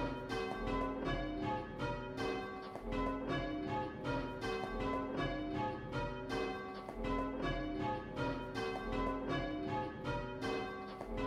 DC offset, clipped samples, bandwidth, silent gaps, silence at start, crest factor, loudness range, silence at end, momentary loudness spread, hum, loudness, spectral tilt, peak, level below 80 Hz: under 0.1%; under 0.1%; 13.5 kHz; none; 0 s; 14 dB; 1 LU; 0 s; 3 LU; none; -40 LUFS; -6.5 dB/octave; -24 dBFS; -50 dBFS